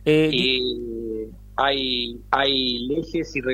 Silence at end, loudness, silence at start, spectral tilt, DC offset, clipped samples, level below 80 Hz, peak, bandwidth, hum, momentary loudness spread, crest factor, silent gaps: 0 s; -22 LUFS; 0 s; -5.5 dB/octave; under 0.1%; under 0.1%; -44 dBFS; -4 dBFS; 14.5 kHz; 50 Hz at -45 dBFS; 12 LU; 18 dB; none